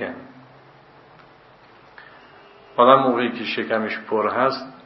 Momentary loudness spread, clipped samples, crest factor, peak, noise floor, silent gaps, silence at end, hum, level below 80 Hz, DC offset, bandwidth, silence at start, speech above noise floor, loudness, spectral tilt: 15 LU; under 0.1%; 22 dB; 0 dBFS; -50 dBFS; none; 0.1 s; none; -70 dBFS; under 0.1%; 6 kHz; 0 s; 30 dB; -20 LUFS; -7 dB/octave